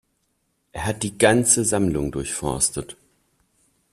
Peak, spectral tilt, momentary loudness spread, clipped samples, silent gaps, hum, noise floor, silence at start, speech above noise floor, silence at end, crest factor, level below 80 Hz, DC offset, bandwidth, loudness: -2 dBFS; -3.5 dB/octave; 15 LU; under 0.1%; none; none; -71 dBFS; 0.75 s; 49 dB; 1 s; 22 dB; -46 dBFS; under 0.1%; 14.5 kHz; -21 LUFS